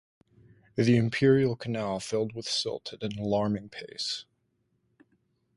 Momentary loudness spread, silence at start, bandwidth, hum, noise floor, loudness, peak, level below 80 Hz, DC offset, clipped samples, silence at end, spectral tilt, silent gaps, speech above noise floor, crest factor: 13 LU; 0.75 s; 11.5 kHz; none; -74 dBFS; -28 LUFS; -12 dBFS; -62 dBFS; under 0.1%; under 0.1%; 1.35 s; -5.5 dB/octave; none; 47 dB; 18 dB